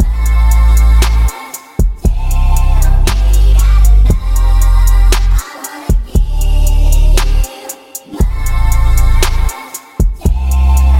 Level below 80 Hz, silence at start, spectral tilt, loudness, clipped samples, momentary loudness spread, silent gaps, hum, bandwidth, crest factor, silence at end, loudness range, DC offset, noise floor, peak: -8 dBFS; 0 s; -5 dB/octave; -13 LUFS; under 0.1%; 11 LU; none; none; 16.5 kHz; 8 dB; 0 s; 4 LU; under 0.1%; -29 dBFS; 0 dBFS